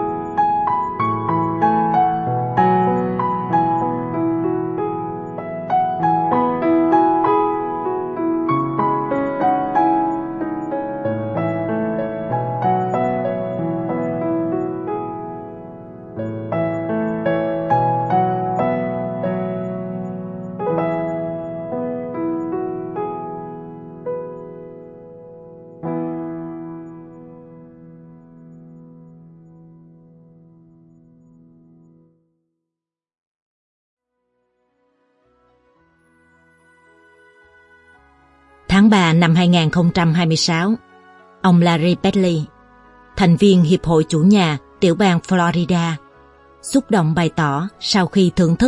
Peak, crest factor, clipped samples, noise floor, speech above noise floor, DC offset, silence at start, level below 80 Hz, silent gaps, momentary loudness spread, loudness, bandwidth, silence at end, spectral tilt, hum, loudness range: 0 dBFS; 20 dB; under 0.1%; -86 dBFS; 71 dB; under 0.1%; 0 s; -48 dBFS; 33.18-33.97 s; 17 LU; -18 LUFS; 11.5 kHz; 0 s; -6.5 dB/octave; none; 14 LU